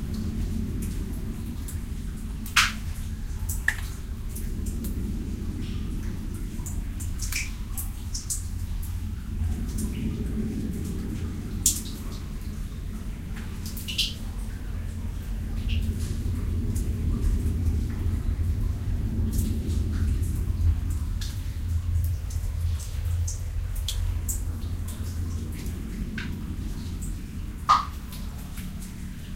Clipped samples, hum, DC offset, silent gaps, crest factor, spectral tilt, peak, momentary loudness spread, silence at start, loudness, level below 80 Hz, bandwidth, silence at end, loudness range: under 0.1%; none; 0.1%; none; 26 dB; -4 dB/octave; -2 dBFS; 9 LU; 0 s; -30 LUFS; -32 dBFS; 16.5 kHz; 0 s; 4 LU